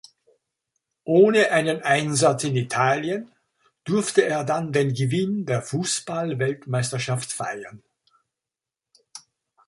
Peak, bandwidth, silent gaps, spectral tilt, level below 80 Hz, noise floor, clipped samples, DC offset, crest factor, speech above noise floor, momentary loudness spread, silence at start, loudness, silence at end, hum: -4 dBFS; 11.5 kHz; none; -5 dB/octave; -64 dBFS; -88 dBFS; under 0.1%; under 0.1%; 20 dB; 66 dB; 12 LU; 1.05 s; -22 LUFS; 0.5 s; none